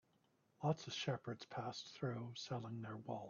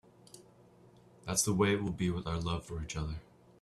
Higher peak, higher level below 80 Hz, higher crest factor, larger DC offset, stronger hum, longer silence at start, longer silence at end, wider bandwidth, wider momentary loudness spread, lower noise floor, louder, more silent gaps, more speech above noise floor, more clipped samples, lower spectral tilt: second, -26 dBFS vs -16 dBFS; second, -82 dBFS vs -52 dBFS; about the same, 20 dB vs 20 dB; neither; neither; first, 0.6 s vs 0.35 s; second, 0 s vs 0.4 s; second, 7 kHz vs 14 kHz; second, 6 LU vs 12 LU; first, -78 dBFS vs -60 dBFS; second, -46 LUFS vs -34 LUFS; neither; first, 33 dB vs 27 dB; neither; about the same, -5 dB/octave vs -4.5 dB/octave